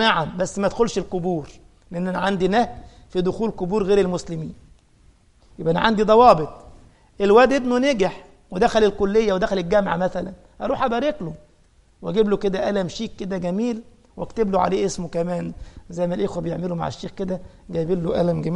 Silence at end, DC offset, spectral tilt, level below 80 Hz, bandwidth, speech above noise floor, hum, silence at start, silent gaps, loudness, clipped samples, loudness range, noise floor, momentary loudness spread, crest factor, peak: 0 s; under 0.1%; -6 dB/octave; -44 dBFS; 11 kHz; 35 dB; none; 0 s; none; -21 LUFS; under 0.1%; 7 LU; -56 dBFS; 15 LU; 20 dB; 0 dBFS